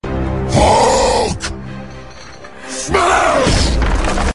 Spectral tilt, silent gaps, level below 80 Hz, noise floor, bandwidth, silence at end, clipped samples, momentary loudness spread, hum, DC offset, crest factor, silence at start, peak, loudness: -4.5 dB/octave; none; -22 dBFS; -35 dBFS; 11.5 kHz; 0 s; under 0.1%; 22 LU; none; 1%; 14 dB; 0 s; 0 dBFS; -14 LUFS